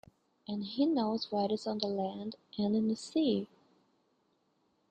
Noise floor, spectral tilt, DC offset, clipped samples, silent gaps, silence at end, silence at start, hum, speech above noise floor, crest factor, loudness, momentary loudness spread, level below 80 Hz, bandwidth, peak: -75 dBFS; -6.5 dB/octave; under 0.1%; under 0.1%; none; 1.45 s; 0.5 s; none; 42 dB; 20 dB; -34 LUFS; 11 LU; -76 dBFS; 9 kHz; -16 dBFS